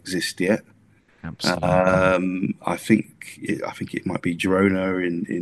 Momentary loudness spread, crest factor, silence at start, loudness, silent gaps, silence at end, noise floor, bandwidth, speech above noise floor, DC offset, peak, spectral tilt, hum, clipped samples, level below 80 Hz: 11 LU; 20 dB; 0.05 s; -22 LUFS; none; 0 s; -57 dBFS; 12.5 kHz; 35 dB; under 0.1%; -2 dBFS; -5.5 dB/octave; none; under 0.1%; -52 dBFS